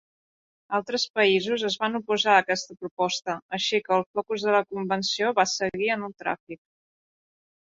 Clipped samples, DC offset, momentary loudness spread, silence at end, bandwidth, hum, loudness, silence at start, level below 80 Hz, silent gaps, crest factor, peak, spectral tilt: under 0.1%; under 0.1%; 10 LU; 1.2 s; 7.8 kHz; none; -25 LUFS; 0.7 s; -70 dBFS; 1.10-1.14 s, 2.91-2.97 s, 3.42-3.49 s, 4.06-4.14 s, 6.40-6.47 s; 22 dB; -4 dBFS; -3 dB/octave